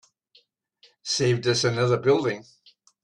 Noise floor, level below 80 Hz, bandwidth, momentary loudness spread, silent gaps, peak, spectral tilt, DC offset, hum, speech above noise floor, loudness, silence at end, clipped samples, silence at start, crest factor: -62 dBFS; -62 dBFS; 11 kHz; 11 LU; none; -8 dBFS; -4.5 dB/octave; under 0.1%; none; 40 dB; -23 LUFS; 0.6 s; under 0.1%; 1.05 s; 18 dB